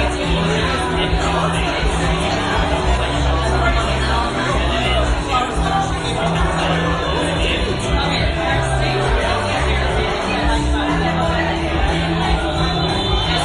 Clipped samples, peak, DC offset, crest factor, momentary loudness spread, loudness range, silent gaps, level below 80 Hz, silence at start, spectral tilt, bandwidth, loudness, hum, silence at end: under 0.1%; -4 dBFS; under 0.1%; 14 dB; 1 LU; 0 LU; none; -24 dBFS; 0 s; -5 dB/octave; 11.5 kHz; -18 LUFS; none; 0 s